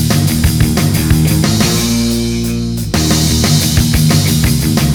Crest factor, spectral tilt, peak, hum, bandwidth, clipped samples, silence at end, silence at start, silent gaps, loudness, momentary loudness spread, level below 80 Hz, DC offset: 12 dB; -4.5 dB/octave; 0 dBFS; none; 20 kHz; under 0.1%; 0 s; 0 s; none; -12 LUFS; 5 LU; -22 dBFS; under 0.1%